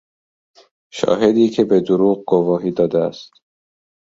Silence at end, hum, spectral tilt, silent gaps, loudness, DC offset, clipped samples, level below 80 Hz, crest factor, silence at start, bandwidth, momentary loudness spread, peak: 0.9 s; none; -7 dB/octave; none; -17 LUFS; under 0.1%; under 0.1%; -56 dBFS; 16 dB; 0.95 s; 7.8 kHz; 10 LU; -2 dBFS